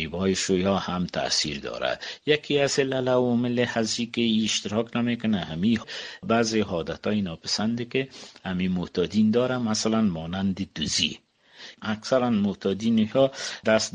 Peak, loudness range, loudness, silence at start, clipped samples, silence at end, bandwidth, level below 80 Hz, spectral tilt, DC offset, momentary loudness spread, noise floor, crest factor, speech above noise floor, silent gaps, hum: -6 dBFS; 2 LU; -25 LUFS; 0 s; under 0.1%; 0.05 s; 9.8 kHz; -56 dBFS; -4.5 dB/octave; under 0.1%; 7 LU; -48 dBFS; 20 dB; 23 dB; none; none